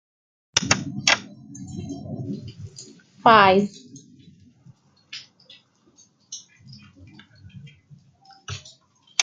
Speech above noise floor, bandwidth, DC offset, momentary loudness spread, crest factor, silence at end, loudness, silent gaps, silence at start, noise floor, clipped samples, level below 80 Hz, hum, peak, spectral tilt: 37 dB; 9.6 kHz; under 0.1%; 27 LU; 26 dB; 0 s; -20 LUFS; none; 0.55 s; -58 dBFS; under 0.1%; -62 dBFS; none; 0 dBFS; -3 dB/octave